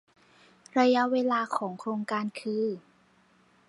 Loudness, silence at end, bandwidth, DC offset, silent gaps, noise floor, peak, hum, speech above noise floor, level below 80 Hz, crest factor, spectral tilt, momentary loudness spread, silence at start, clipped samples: -28 LUFS; 0.9 s; 11.5 kHz; under 0.1%; none; -63 dBFS; -10 dBFS; none; 36 dB; -82 dBFS; 20 dB; -5.5 dB/octave; 10 LU; 0.75 s; under 0.1%